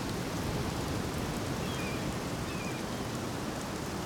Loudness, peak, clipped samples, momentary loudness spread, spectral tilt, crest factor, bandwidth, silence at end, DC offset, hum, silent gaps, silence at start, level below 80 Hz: -35 LUFS; -22 dBFS; under 0.1%; 2 LU; -5 dB/octave; 12 dB; over 20 kHz; 0 s; under 0.1%; none; none; 0 s; -48 dBFS